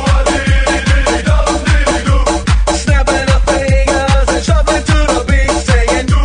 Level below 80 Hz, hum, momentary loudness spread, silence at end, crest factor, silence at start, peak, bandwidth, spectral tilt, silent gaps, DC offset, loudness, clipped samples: -14 dBFS; none; 1 LU; 0 s; 10 dB; 0 s; 0 dBFS; 10.5 kHz; -5 dB/octave; none; under 0.1%; -12 LUFS; under 0.1%